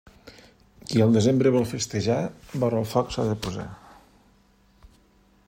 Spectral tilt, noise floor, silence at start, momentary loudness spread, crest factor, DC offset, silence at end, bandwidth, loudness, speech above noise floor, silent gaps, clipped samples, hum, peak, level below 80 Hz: -6 dB/octave; -60 dBFS; 0.25 s; 13 LU; 20 dB; under 0.1%; 1.7 s; 16 kHz; -24 LUFS; 37 dB; none; under 0.1%; none; -6 dBFS; -52 dBFS